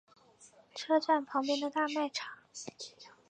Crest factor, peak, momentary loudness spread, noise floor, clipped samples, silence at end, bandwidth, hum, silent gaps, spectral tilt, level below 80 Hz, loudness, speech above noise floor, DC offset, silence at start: 20 dB; -16 dBFS; 18 LU; -61 dBFS; under 0.1%; 0.2 s; 9.6 kHz; none; none; -2.5 dB/octave; -88 dBFS; -33 LUFS; 28 dB; under 0.1%; 0.4 s